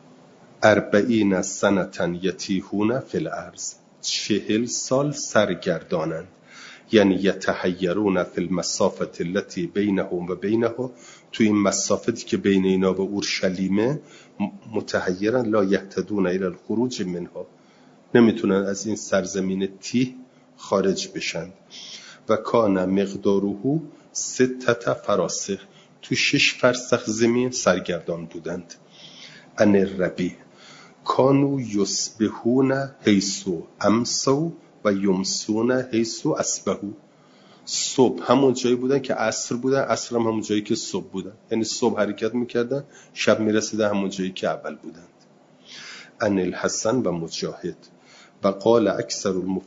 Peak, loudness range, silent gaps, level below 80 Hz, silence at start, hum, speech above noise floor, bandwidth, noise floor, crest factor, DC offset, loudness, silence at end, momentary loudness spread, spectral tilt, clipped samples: -2 dBFS; 3 LU; none; -64 dBFS; 0.6 s; none; 31 dB; 7.8 kHz; -54 dBFS; 20 dB; under 0.1%; -23 LUFS; 0.05 s; 13 LU; -4.5 dB/octave; under 0.1%